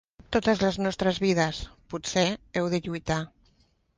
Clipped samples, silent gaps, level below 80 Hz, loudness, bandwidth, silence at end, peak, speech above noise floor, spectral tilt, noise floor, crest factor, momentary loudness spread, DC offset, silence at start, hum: under 0.1%; none; -50 dBFS; -27 LUFS; 10 kHz; 0.7 s; -10 dBFS; 39 dB; -5 dB/octave; -66 dBFS; 18 dB; 10 LU; under 0.1%; 0.3 s; none